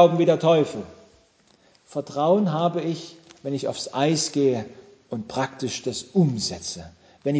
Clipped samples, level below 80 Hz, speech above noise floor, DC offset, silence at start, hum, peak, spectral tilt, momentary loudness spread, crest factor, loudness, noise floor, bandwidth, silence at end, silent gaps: under 0.1%; -60 dBFS; 36 dB; under 0.1%; 0 s; none; -4 dBFS; -5.5 dB/octave; 16 LU; 20 dB; -24 LUFS; -59 dBFS; 8 kHz; 0 s; none